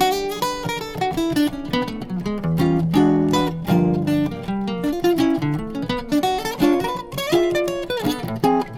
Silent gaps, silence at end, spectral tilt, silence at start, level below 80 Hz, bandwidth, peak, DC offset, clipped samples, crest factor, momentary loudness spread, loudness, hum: none; 0 s; -6 dB/octave; 0 s; -42 dBFS; 18 kHz; -4 dBFS; under 0.1%; under 0.1%; 16 dB; 8 LU; -21 LUFS; none